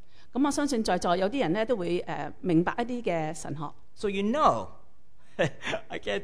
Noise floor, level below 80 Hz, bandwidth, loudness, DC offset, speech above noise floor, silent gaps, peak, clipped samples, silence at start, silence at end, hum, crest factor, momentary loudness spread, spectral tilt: -63 dBFS; -54 dBFS; 11 kHz; -29 LUFS; 1%; 35 dB; none; -8 dBFS; under 0.1%; 0.35 s; 0 s; none; 20 dB; 12 LU; -5.5 dB/octave